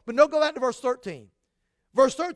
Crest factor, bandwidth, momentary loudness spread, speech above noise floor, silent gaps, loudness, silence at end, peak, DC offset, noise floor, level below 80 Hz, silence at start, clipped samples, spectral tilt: 20 dB; 11 kHz; 16 LU; 53 dB; none; -24 LUFS; 0 s; -4 dBFS; under 0.1%; -77 dBFS; -64 dBFS; 0.05 s; under 0.1%; -3.5 dB/octave